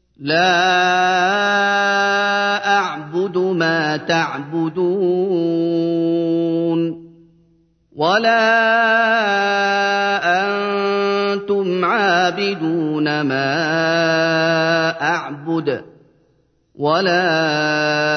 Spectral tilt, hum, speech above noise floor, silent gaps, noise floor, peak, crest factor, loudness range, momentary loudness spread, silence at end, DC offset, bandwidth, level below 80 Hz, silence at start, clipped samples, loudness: -5 dB/octave; none; 44 dB; none; -60 dBFS; -2 dBFS; 14 dB; 4 LU; 7 LU; 0 s; under 0.1%; 6.6 kHz; -66 dBFS; 0.2 s; under 0.1%; -17 LUFS